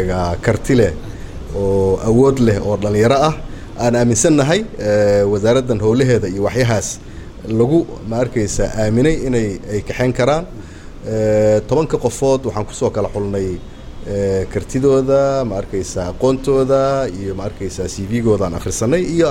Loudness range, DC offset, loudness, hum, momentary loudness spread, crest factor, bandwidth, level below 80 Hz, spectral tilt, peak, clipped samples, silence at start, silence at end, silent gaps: 4 LU; under 0.1%; -16 LUFS; none; 11 LU; 16 dB; 16.5 kHz; -32 dBFS; -6 dB/octave; 0 dBFS; under 0.1%; 0 s; 0 s; none